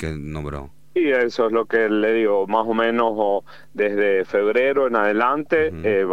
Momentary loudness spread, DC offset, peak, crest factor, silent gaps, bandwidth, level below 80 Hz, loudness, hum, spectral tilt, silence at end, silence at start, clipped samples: 11 LU; 0.8%; -4 dBFS; 16 dB; none; 9 kHz; -46 dBFS; -20 LUFS; none; -7 dB/octave; 0 s; 0 s; under 0.1%